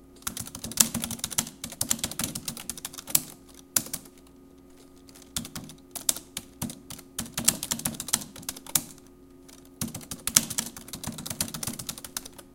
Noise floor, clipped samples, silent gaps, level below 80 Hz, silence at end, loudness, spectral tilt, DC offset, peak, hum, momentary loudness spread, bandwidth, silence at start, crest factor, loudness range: -52 dBFS; under 0.1%; none; -56 dBFS; 0 s; -29 LUFS; -1.5 dB/octave; under 0.1%; 0 dBFS; none; 15 LU; 17 kHz; 0 s; 32 dB; 5 LU